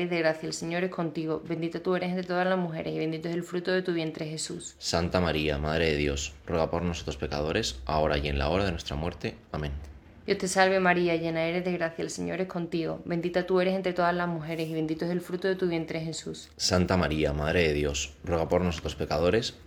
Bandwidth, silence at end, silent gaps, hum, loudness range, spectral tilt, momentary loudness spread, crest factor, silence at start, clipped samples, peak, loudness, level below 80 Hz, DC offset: 16 kHz; 0.05 s; none; none; 3 LU; -5 dB/octave; 8 LU; 20 dB; 0 s; under 0.1%; -8 dBFS; -29 LUFS; -44 dBFS; under 0.1%